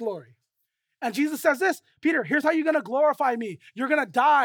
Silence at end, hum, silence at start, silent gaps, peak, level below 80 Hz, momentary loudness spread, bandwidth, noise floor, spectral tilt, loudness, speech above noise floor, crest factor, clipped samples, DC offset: 0 s; none; 0 s; none; -8 dBFS; -82 dBFS; 11 LU; 19.5 kHz; -79 dBFS; -4.5 dB/octave; -24 LUFS; 55 dB; 16 dB; under 0.1%; under 0.1%